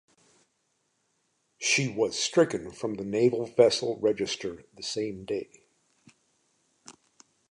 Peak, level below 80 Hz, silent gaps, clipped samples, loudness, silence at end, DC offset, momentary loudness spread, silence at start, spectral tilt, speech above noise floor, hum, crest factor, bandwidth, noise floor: -6 dBFS; -66 dBFS; none; under 0.1%; -27 LUFS; 0.6 s; under 0.1%; 12 LU; 1.6 s; -3.5 dB/octave; 48 dB; none; 24 dB; 11 kHz; -75 dBFS